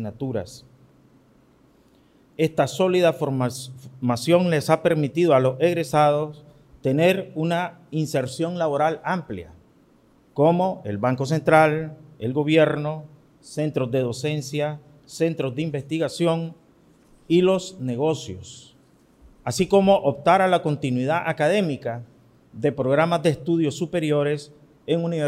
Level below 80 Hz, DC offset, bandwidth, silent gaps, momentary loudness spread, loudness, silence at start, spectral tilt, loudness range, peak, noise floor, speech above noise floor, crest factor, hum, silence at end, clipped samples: -60 dBFS; under 0.1%; 15.5 kHz; none; 13 LU; -22 LUFS; 0 s; -6.5 dB/octave; 5 LU; -2 dBFS; -57 dBFS; 35 dB; 20 dB; none; 0 s; under 0.1%